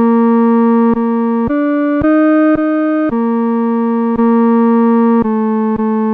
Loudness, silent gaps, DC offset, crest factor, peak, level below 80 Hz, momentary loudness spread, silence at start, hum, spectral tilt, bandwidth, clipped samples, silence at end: -12 LUFS; none; under 0.1%; 8 dB; -4 dBFS; -42 dBFS; 4 LU; 0 s; none; -10.5 dB/octave; 3.7 kHz; under 0.1%; 0 s